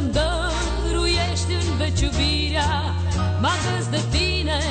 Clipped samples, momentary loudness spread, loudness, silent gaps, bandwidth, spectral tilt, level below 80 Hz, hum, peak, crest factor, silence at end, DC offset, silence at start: under 0.1%; 3 LU; -22 LUFS; none; 9.2 kHz; -4.5 dB/octave; -28 dBFS; none; -10 dBFS; 10 dB; 0 s; under 0.1%; 0 s